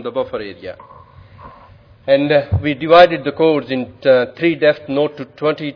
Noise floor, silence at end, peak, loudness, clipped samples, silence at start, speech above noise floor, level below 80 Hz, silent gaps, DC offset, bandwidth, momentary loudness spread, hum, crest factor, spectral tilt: -44 dBFS; 0.05 s; 0 dBFS; -15 LUFS; 0.1%; 0 s; 29 dB; -46 dBFS; none; under 0.1%; 5.4 kHz; 16 LU; none; 16 dB; -8 dB/octave